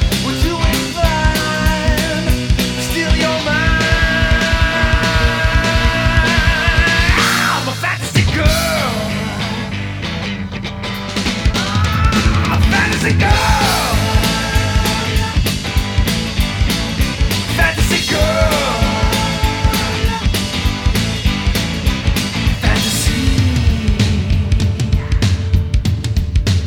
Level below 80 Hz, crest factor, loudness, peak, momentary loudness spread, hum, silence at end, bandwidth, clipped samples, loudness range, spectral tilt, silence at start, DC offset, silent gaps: -20 dBFS; 14 dB; -15 LUFS; 0 dBFS; 5 LU; none; 0 s; 19.5 kHz; under 0.1%; 3 LU; -4.5 dB/octave; 0 s; under 0.1%; none